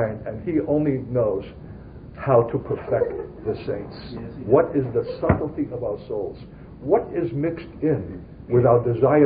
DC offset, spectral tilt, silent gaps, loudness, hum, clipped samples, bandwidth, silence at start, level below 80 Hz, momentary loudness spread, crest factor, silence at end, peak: under 0.1%; -13 dB/octave; none; -23 LUFS; none; under 0.1%; 5 kHz; 0 s; -44 dBFS; 17 LU; 20 dB; 0 s; -2 dBFS